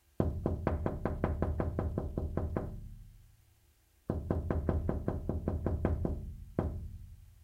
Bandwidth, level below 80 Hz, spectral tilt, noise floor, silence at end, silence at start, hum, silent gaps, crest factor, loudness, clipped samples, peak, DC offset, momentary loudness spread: 4.8 kHz; -42 dBFS; -10 dB/octave; -67 dBFS; 0 s; 0.2 s; none; none; 22 dB; -36 LUFS; under 0.1%; -14 dBFS; under 0.1%; 14 LU